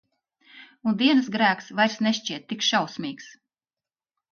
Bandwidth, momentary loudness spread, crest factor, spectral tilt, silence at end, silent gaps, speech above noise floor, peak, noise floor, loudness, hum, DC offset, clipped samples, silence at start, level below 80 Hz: 7 kHz; 12 LU; 18 dB; -3.5 dB/octave; 1 s; none; over 66 dB; -8 dBFS; under -90 dBFS; -24 LUFS; none; under 0.1%; under 0.1%; 0.55 s; -74 dBFS